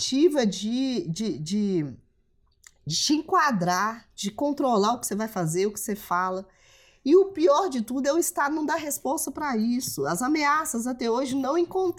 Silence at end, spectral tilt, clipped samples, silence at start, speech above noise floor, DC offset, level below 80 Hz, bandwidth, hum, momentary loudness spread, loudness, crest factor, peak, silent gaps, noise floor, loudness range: 0 s; -4 dB/octave; under 0.1%; 0 s; 40 dB; under 0.1%; -62 dBFS; 18 kHz; none; 8 LU; -25 LUFS; 16 dB; -10 dBFS; none; -65 dBFS; 2 LU